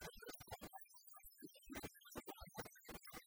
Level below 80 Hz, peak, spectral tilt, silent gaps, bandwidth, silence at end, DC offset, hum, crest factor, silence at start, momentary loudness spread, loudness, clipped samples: -70 dBFS; -36 dBFS; -3.5 dB/octave; none; over 20 kHz; 0 s; under 0.1%; none; 20 dB; 0 s; 6 LU; -56 LUFS; under 0.1%